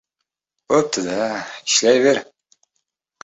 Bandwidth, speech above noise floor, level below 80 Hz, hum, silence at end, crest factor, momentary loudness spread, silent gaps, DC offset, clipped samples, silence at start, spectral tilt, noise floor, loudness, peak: 8.4 kHz; 62 dB; -64 dBFS; none; 1 s; 18 dB; 9 LU; none; under 0.1%; under 0.1%; 0.7 s; -2.5 dB/octave; -80 dBFS; -18 LUFS; -4 dBFS